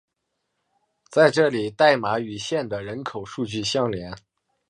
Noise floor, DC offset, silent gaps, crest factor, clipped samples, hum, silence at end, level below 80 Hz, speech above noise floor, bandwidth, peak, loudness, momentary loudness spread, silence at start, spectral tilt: -78 dBFS; under 0.1%; none; 22 dB; under 0.1%; none; 0.5 s; -58 dBFS; 56 dB; 10.5 kHz; -2 dBFS; -22 LUFS; 14 LU; 1.1 s; -4.5 dB/octave